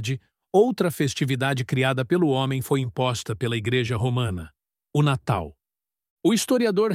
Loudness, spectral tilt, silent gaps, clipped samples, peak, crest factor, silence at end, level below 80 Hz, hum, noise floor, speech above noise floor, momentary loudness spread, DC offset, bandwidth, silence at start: -24 LUFS; -5.5 dB/octave; 6.10-6.17 s; under 0.1%; -8 dBFS; 16 dB; 0 s; -54 dBFS; none; under -90 dBFS; over 67 dB; 7 LU; under 0.1%; 16 kHz; 0 s